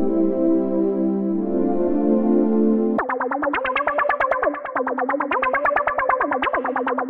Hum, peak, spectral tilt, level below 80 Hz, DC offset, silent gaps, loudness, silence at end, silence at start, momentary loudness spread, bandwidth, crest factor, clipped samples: none; -6 dBFS; -9 dB/octave; -50 dBFS; under 0.1%; none; -20 LUFS; 0 s; 0 s; 4 LU; 4.3 kHz; 14 dB; under 0.1%